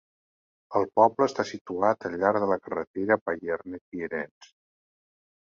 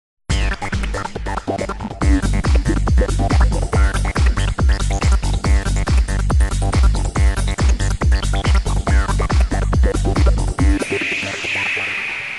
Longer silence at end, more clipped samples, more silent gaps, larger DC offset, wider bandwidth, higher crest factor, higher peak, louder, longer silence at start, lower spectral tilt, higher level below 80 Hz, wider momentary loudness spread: first, 1.1 s vs 0 s; neither; first, 1.61-1.65 s, 2.87-2.94 s, 3.21-3.26 s, 3.81-3.92 s, 4.31-4.41 s vs none; second, under 0.1% vs 0.2%; second, 7.6 kHz vs 11.5 kHz; first, 22 dB vs 12 dB; about the same, -6 dBFS vs -4 dBFS; second, -27 LUFS vs -18 LUFS; first, 0.7 s vs 0.3 s; about the same, -6 dB/octave vs -5.5 dB/octave; second, -66 dBFS vs -18 dBFS; first, 12 LU vs 6 LU